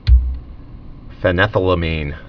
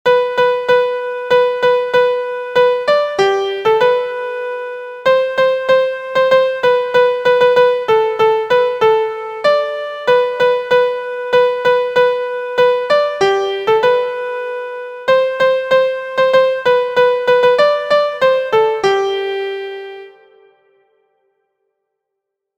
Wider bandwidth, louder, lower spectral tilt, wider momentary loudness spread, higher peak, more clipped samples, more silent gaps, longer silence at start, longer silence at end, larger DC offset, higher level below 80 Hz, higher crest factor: second, 5.4 kHz vs 8.2 kHz; second, -17 LUFS vs -14 LUFS; first, -8.5 dB/octave vs -4 dB/octave; first, 20 LU vs 9 LU; about the same, 0 dBFS vs 0 dBFS; neither; neither; about the same, 0.05 s vs 0.05 s; second, 0 s vs 2.5 s; neither; first, -20 dBFS vs -58 dBFS; about the same, 16 dB vs 14 dB